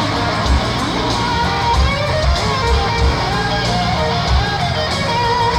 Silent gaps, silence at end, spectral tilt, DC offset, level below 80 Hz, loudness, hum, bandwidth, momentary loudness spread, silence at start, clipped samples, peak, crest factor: none; 0 s; -5 dB/octave; under 0.1%; -22 dBFS; -16 LUFS; none; 12 kHz; 2 LU; 0 s; under 0.1%; -2 dBFS; 14 dB